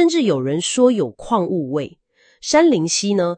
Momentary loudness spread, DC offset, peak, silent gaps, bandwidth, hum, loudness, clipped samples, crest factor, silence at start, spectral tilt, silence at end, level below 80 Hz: 10 LU; under 0.1%; 0 dBFS; none; 9.6 kHz; none; -18 LUFS; under 0.1%; 18 dB; 0 s; -4.5 dB/octave; 0 s; -54 dBFS